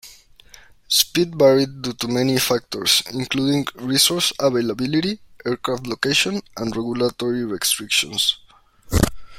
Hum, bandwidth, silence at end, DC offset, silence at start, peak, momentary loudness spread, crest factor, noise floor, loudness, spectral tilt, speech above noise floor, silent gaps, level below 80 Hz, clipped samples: none; 16.5 kHz; 0 s; under 0.1%; 0.05 s; 0 dBFS; 9 LU; 20 dB; -47 dBFS; -20 LUFS; -3.5 dB/octave; 27 dB; none; -40 dBFS; under 0.1%